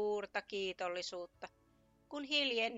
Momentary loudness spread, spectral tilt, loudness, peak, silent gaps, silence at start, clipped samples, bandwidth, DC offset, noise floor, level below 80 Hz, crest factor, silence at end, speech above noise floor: 17 LU; -2.5 dB/octave; -38 LUFS; -22 dBFS; none; 0 s; under 0.1%; 8.2 kHz; under 0.1%; -71 dBFS; -76 dBFS; 18 dB; 0 s; 32 dB